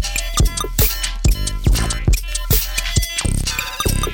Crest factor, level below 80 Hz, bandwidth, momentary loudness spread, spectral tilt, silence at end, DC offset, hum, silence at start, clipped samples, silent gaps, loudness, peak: 12 dB; -20 dBFS; over 20 kHz; 3 LU; -3.5 dB/octave; 0 s; under 0.1%; none; 0 s; under 0.1%; none; -19 LUFS; -6 dBFS